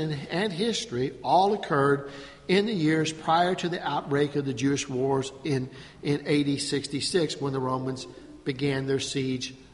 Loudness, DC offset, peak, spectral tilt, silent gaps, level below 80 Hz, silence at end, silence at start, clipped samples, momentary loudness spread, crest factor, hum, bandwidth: -27 LUFS; under 0.1%; -10 dBFS; -5 dB/octave; none; -58 dBFS; 0.1 s; 0 s; under 0.1%; 9 LU; 16 dB; none; 11.5 kHz